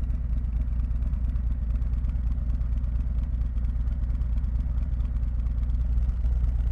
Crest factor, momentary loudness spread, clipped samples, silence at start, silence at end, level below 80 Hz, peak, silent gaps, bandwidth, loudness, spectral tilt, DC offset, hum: 10 dB; 2 LU; under 0.1%; 0 s; 0 s; -26 dBFS; -14 dBFS; none; 2.7 kHz; -29 LUFS; -10 dB/octave; under 0.1%; none